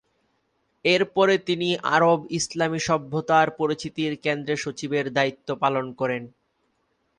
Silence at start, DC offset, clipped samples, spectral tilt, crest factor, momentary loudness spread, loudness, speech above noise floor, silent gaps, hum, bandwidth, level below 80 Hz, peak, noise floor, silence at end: 0.85 s; under 0.1%; under 0.1%; -4.5 dB/octave; 18 dB; 8 LU; -23 LUFS; 48 dB; none; none; 11 kHz; -62 dBFS; -6 dBFS; -71 dBFS; 0.9 s